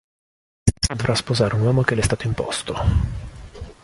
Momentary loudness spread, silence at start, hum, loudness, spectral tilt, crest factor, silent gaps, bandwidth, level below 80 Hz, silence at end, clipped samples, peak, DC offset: 16 LU; 0.65 s; none; -21 LUFS; -5 dB/octave; 20 dB; none; 11.5 kHz; -30 dBFS; 0.1 s; under 0.1%; -2 dBFS; under 0.1%